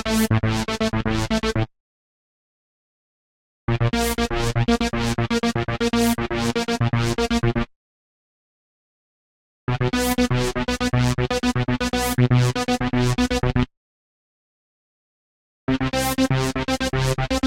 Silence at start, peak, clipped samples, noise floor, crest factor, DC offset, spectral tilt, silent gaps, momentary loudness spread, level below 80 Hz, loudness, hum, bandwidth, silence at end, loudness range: 0 s; -6 dBFS; under 0.1%; under -90 dBFS; 16 dB; under 0.1%; -5.5 dB/octave; 1.80-3.68 s, 7.76-9.67 s, 13.77-15.67 s; 4 LU; -34 dBFS; -22 LUFS; none; 16.5 kHz; 0 s; 5 LU